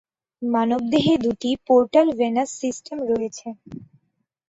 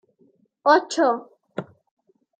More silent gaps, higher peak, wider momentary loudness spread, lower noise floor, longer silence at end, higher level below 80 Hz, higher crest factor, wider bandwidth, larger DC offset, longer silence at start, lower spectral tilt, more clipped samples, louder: neither; about the same, -4 dBFS vs -2 dBFS; about the same, 18 LU vs 18 LU; first, -73 dBFS vs -62 dBFS; about the same, 0.65 s vs 0.75 s; first, -58 dBFS vs -78 dBFS; about the same, 18 dB vs 22 dB; second, 8 kHz vs 9.4 kHz; neither; second, 0.4 s vs 0.65 s; first, -5.5 dB/octave vs -4 dB/octave; neither; about the same, -21 LUFS vs -21 LUFS